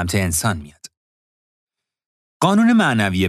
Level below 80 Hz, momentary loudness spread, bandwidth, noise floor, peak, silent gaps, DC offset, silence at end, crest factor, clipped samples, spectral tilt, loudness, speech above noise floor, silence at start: -46 dBFS; 9 LU; 15 kHz; under -90 dBFS; -2 dBFS; 0.97-1.67 s, 2.06-2.40 s; under 0.1%; 0 s; 16 dB; under 0.1%; -5 dB/octave; -17 LUFS; over 73 dB; 0 s